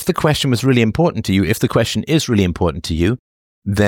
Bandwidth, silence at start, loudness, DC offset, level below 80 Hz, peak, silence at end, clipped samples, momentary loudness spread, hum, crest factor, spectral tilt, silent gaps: 18.5 kHz; 0 s; -16 LUFS; under 0.1%; -36 dBFS; -2 dBFS; 0 s; under 0.1%; 5 LU; none; 14 dB; -5.5 dB/octave; 3.19-3.62 s